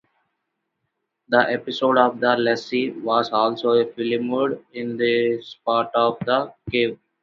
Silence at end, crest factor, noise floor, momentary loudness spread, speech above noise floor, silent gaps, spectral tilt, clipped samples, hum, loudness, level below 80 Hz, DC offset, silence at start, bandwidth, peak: 0.3 s; 20 dB; -77 dBFS; 6 LU; 57 dB; none; -6 dB/octave; under 0.1%; none; -21 LUFS; -60 dBFS; under 0.1%; 1.3 s; 7.2 kHz; -2 dBFS